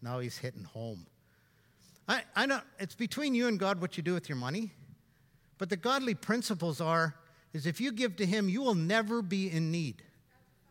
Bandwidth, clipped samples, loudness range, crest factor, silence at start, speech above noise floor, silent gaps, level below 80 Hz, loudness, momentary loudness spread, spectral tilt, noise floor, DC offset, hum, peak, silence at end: 16.5 kHz; under 0.1%; 3 LU; 20 dB; 0 s; 35 dB; none; -76 dBFS; -33 LUFS; 13 LU; -5.5 dB/octave; -67 dBFS; under 0.1%; none; -14 dBFS; 0.7 s